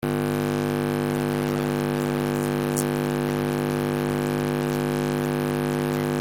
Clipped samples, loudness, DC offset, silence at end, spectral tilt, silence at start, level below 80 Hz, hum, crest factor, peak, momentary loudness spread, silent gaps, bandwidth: under 0.1%; -25 LUFS; under 0.1%; 0 s; -6 dB/octave; 0 s; -46 dBFS; 50 Hz at -30 dBFS; 18 dB; -6 dBFS; 1 LU; none; 17 kHz